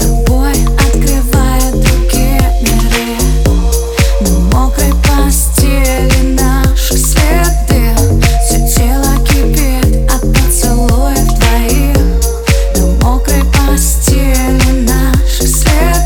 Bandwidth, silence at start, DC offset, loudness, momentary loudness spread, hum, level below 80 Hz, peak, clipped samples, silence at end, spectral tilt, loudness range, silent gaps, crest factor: 19 kHz; 0 s; under 0.1%; -11 LUFS; 2 LU; none; -10 dBFS; 0 dBFS; under 0.1%; 0 s; -4.5 dB/octave; 1 LU; none; 8 dB